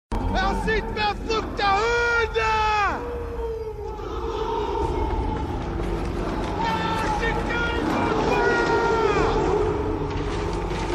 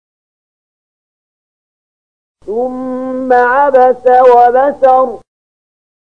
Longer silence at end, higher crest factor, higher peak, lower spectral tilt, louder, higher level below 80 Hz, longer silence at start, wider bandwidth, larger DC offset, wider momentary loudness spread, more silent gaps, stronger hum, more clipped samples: second, 0 s vs 0.85 s; about the same, 14 dB vs 12 dB; second, -8 dBFS vs 0 dBFS; about the same, -5.5 dB/octave vs -6 dB/octave; second, -24 LUFS vs -9 LUFS; first, -32 dBFS vs -54 dBFS; second, 0.1 s vs 2.45 s; first, 13 kHz vs 5.6 kHz; second, under 0.1% vs 0.7%; second, 9 LU vs 12 LU; neither; neither; neither